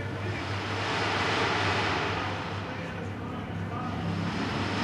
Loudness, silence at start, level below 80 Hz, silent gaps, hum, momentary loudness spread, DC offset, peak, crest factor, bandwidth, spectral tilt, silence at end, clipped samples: -30 LUFS; 0 s; -54 dBFS; none; none; 9 LU; under 0.1%; -14 dBFS; 16 dB; 12 kHz; -5 dB/octave; 0 s; under 0.1%